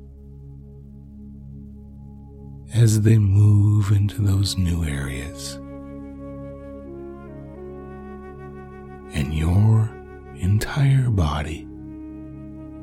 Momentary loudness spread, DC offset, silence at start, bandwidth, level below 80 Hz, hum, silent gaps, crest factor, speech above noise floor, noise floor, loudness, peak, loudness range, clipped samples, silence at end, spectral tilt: 25 LU; under 0.1%; 0 s; 13.5 kHz; -38 dBFS; none; none; 16 dB; 23 dB; -41 dBFS; -20 LUFS; -6 dBFS; 16 LU; under 0.1%; 0 s; -6.5 dB/octave